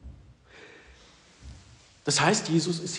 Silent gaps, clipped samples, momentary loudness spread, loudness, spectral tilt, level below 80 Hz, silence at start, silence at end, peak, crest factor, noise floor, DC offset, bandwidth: none; under 0.1%; 27 LU; -25 LUFS; -3.5 dB/octave; -54 dBFS; 0.05 s; 0 s; -8 dBFS; 22 dB; -55 dBFS; under 0.1%; 10.5 kHz